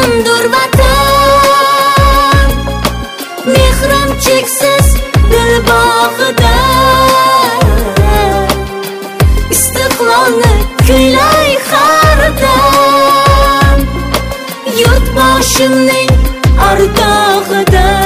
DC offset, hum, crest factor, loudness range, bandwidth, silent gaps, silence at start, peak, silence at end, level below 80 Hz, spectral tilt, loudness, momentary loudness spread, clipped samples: under 0.1%; none; 8 dB; 3 LU; 16.5 kHz; none; 0 s; 0 dBFS; 0 s; -14 dBFS; -4 dB/octave; -8 LUFS; 7 LU; 0.8%